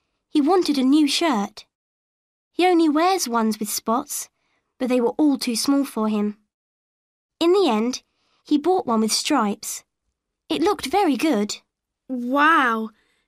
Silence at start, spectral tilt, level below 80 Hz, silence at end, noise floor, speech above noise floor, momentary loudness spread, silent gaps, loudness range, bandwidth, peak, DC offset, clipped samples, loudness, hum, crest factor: 0.35 s; -3.5 dB/octave; -64 dBFS; 0.4 s; -78 dBFS; 58 dB; 12 LU; 1.75-2.51 s, 6.54-7.29 s; 3 LU; 15.5 kHz; -6 dBFS; under 0.1%; under 0.1%; -21 LUFS; none; 16 dB